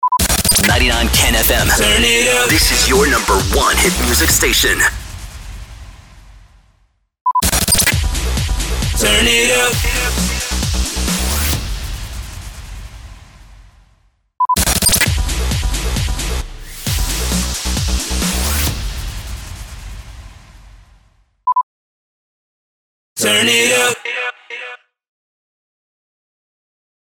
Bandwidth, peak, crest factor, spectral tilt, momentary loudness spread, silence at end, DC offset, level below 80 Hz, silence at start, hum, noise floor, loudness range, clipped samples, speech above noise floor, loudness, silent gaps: over 20 kHz; -2 dBFS; 16 dB; -2.5 dB/octave; 20 LU; 2.4 s; under 0.1%; -24 dBFS; 0 s; none; -58 dBFS; 13 LU; under 0.1%; 45 dB; -14 LUFS; 7.21-7.25 s, 21.63-23.16 s